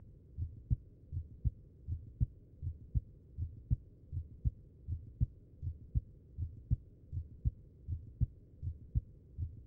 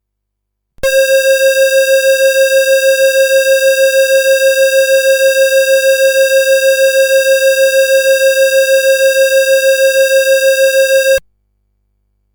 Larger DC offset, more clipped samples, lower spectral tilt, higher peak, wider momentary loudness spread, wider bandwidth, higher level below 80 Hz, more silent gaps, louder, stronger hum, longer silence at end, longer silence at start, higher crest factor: neither; neither; first, -12.5 dB/octave vs 2.5 dB/octave; second, -20 dBFS vs -4 dBFS; first, 8 LU vs 1 LU; second, 0.8 kHz vs over 20 kHz; first, -44 dBFS vs -50 dBFS; neither; second, -43 LUFS vs -9 LUFS; second, none vs 50 Hz at -65 dBFS; second, 0 s vs 1.15 s; second, 0 s vs 0.85 s; first, 20 dB vs 6 dB